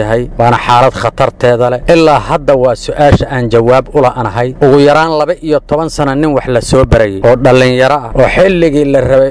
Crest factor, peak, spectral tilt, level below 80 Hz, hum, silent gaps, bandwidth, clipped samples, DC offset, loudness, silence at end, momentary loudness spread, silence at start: 8 dB; 0 dBFS; -6.5 dB/octave; -26 dBFS; none; none; 11 kHz; 5%; 0.8%; -9 LUFS; 0 s; 6 LU; 0 s